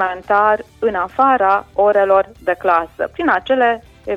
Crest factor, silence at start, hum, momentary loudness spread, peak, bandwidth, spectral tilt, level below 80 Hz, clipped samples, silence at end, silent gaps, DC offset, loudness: 14 dB; 0 s; none; 7 LU; -2 dBFS; 7.6 kHz; -6 dB/octave; -48 dBFS; under 0.1%; 0 s; none; under 0.1%; -16 LUFS